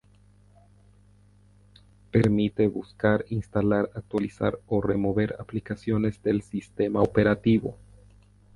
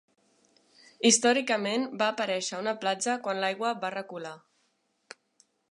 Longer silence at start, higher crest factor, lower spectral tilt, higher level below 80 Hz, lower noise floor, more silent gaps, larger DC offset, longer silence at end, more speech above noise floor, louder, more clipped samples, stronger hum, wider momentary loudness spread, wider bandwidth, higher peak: first, 2.15 s vs 1 s; about the same, 20 dB vs 22 dB; first, -8.5 dB/octave vs -2 dB/octave; first, -50 dBFS vs -82 dBFS; second, -57 dBFS vs -74 dBFS; neither; neither; second, 0.8 s vs 1.3 s; second, 32 dB vs 45 dB; about the same, -26 LUFS vs -27 LUFS; neither; first, 50 Hz at -45 dBFS vs none; second, 8 LU vs 14 LU; about the same, 11 kHz vs 11.5 kHz; about the same, -6 dBFS vs -8 dBFS